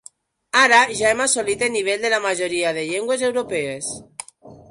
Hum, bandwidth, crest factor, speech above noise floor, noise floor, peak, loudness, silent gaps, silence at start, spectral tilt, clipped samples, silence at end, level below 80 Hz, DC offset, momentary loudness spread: none; 11.5 kHz; 18 dB; 29 dB; -49 dBFS; -2 dBFS; -19 LUFS; none; 0.55 s; -1.5 dB/octave; under 0.1%; 0.15 s; -58 dBFS; under 0.1%; 15 LU